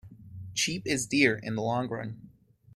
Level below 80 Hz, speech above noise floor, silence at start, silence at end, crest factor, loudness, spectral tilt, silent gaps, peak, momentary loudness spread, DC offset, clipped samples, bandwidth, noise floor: -62 dBFS; 28 dB; 0.05 s; 0.45 s; 22 dB; -28 LUFS; -3.5 dB/octave; none; -8 dBFS; 21 LU; under 0.1%; under 0.1%; 14.5 kHz; -57 dBFS